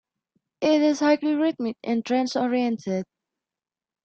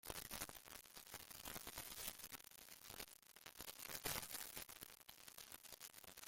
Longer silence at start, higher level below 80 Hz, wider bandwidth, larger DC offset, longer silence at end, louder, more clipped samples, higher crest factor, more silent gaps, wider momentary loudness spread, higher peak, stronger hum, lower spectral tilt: first, 0.6 s vs 0.05 s; about the same, -70 dBFS vs -72 dBFS; second, 8 kHz vs 17 kHz; neither; first, 1 s vs 0 s; first, -24 LUFS vs -52 LUFS; neither; second, 16 dB vs 30 dB; neither; about the same, 10 LU vs 11 LU; first, -8 dBFS vs -24 dBFS; neither; first, -5 dB/octave vs -1 dB/octave